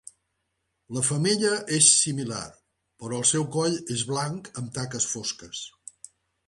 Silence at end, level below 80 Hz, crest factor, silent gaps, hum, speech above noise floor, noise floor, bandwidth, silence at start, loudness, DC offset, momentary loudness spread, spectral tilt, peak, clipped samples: 0.8 s; -64 dBFS; 24 dB; none; none; 52 dB; -78 dBFS; 11.5 kHz; 0.9 s; -24 LUFS; under 0.1%; 19 LU; -3 dB/octave; -4 dBFS; under 0.1%